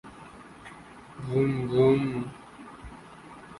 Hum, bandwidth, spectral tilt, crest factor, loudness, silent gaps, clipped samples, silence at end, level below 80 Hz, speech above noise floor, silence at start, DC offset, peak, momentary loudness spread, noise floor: none; 11.5 kHz; -8.5 dB/octave; 20 dB; -26 LUFS; none; under 0.1%; 0 s; -56 dBFS; 23 dB; 0.05 s; under 0.1%; -10 dBFS; 24 LU; -48 dBFS